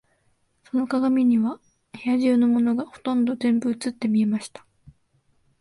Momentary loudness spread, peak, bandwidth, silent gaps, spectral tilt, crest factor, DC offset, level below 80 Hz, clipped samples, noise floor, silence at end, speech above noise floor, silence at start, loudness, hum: 10 LU; -10 dBFS; 11.5 kHz; none; -6.5 dB/octave; 14 dB; under 0.1%; -66 dBFS; under 0.1%; -67 dBFS; 1.15 s; 45 dB; 0.75 s; -23 LUFS; none